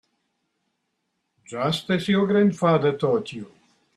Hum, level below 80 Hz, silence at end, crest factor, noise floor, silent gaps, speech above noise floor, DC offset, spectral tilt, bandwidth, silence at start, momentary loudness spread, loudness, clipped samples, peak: none; -66 dBFS; 0.5 s; 16 dB; -76 dBFS; none; 55 dB; under 0.1%; -6.5 dB/octave; 12.5 kHz; 1.5 s; 16 LU; -22 LUFS; under 0.1%; -8 dBFS